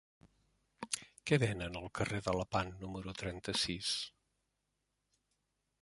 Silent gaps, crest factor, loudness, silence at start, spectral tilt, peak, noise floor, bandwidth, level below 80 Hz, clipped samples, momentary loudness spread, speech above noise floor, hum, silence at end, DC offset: none; 26 dB; -38 LUFS; 0.25 s; -4 dB/octave; -16 dBFS; -85 dBFS; 11.5 kHz; -60 dBFS; under 0.1%; 11 LU; 47 dB; 50 Hz at -65 dBFS; 1.7 s; under 0.1%